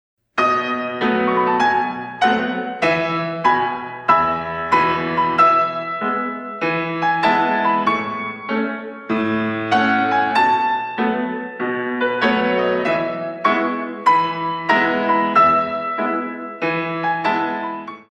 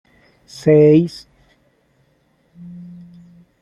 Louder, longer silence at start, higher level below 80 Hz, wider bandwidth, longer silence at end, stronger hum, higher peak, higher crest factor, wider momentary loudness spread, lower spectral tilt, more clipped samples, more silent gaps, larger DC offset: second, -18 LUFS vs -14 LUFS; second, 0.35 s vs 0.65 s; about the same, -56 dBFS vs -56 dBFS; about the same, 10.5 kHz vs 10.5 kHz; second, 0.1 s vs 0.8 s; neither; about the same, -2 dBFS vs -2 dBFS; about the same, 18 dB vs 18 dB; second, 8 LU vs 28 LU; second, -6 dB/octave vs -8.5 dB/octave; neither; neither; neither